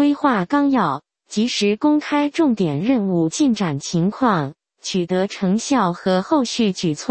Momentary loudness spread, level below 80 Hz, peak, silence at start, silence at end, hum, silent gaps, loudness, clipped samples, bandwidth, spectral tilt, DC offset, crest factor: 5 LU; -58 dBFS; -2 dBFS; 0 s; 0 s; none; none; -19 LUFS; under 0.1%; 8.8 kHz; -5.5 dB/octave; under 0.1%; 16 dB